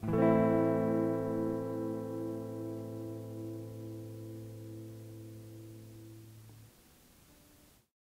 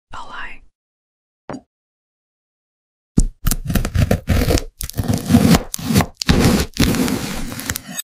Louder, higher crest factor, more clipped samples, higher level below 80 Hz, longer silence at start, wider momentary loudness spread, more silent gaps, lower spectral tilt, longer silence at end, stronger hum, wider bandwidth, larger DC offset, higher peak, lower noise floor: second, -34 LUFS vs -18 LUFS; about the same, 22 dB vs 20 dB; neither; second, -64 dBFS vs -26 dBFS; about the same, 0 s vs 0.1 s; first, 23 LU vs 18 LU; second, none vs 0.75-1.48 s, 1.67-3.15 s; first, -8.5 dB/octave vs -5 dB/octave; first, 0.65 s vs 0 s; neither; about the same, 16 kHz vs 16.5 kHz; neither; second, -14 dBFS vs 0 dBFS; second, -63 dBFS vs under -90 dBFS